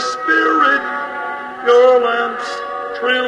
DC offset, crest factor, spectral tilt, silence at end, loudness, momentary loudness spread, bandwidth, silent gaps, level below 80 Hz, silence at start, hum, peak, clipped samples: under 0.1%; 14 dB; -2 dB/octave; 0 s; -15 LUFS; 13 LU; 9.6 kHz; none; -60 dBFS; 0 s; none; -2 dBFS; under 0.1%